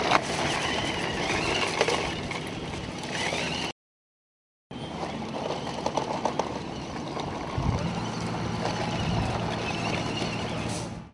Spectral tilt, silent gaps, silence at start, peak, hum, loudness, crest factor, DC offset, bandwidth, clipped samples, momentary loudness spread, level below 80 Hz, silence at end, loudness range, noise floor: -4.5 dB/octave; 3.72-4.70 s; 0 s; -4 dBFS; none; -29 LUFS; 26 dB; under 0.1%; 11.5 kHz; under 0.1%; 9 LU; -46 dBFS; 0 s; 5 LU; under -90 dBFS